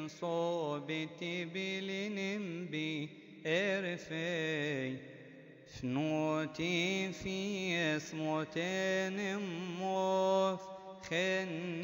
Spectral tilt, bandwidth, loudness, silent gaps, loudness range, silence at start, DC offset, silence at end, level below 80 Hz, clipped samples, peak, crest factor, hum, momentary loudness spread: -5 dB/octave; 16 kHz; -36 LUFS; none; 3 LU; 0 s; under 0.1%; 0 s; -72 dBFS; under 0.1%; -20 dBFS; 16 dB; none; 10 LU